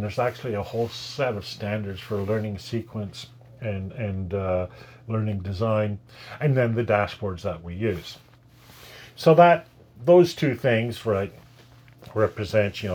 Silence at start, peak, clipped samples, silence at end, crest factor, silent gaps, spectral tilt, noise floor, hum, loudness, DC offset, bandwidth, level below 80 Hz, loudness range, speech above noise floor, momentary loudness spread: 0 s; -2 dBFS; under 0.1%; 0 s; 22 dB; none; -7 dB/octave; -51 dBFS; none; -24 LUFS; under 0.1%; 19.5 kHz; -58 dBFS; 9 LU; 27 dB; 17 LU